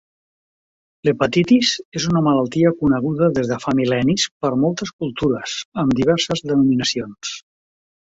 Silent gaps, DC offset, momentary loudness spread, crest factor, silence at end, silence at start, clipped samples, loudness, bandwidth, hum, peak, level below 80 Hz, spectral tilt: 1.85-1.92 s, 4.31-4.40 s, 4.93-4.99 s, 5.65-5.72 s; under 0.1%; 9 LU; 16 dB; 0.7 s; 1.05 s; under 0.1%; -19 LUFS; 8 kHz; none; -2 dBFS; -50 dBFS; -5 dB/octave